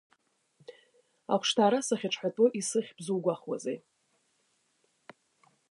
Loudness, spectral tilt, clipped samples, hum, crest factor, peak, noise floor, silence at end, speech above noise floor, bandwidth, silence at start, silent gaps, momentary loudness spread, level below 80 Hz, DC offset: -30 LUFS; -4 dB/octave; under 0.1%; none; 20 dB; -12 dBFS; -74 dBFS; 1.95 s; 45 dB; 11.5 kHz; 0.7 s; none; 11 LU; -86 dBFS; under 0.1%